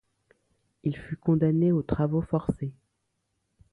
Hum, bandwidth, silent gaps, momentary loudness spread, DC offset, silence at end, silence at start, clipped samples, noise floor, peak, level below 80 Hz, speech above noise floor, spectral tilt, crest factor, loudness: none; 4 kHz; none; 11 LU; under 0.1%; 1 s; 0.85 s; under 0.1%; -78 dBFS; -10 dBFS; -50 dBFS; 52 dB; -11 dB/octave; 18 dB; -27 LUFS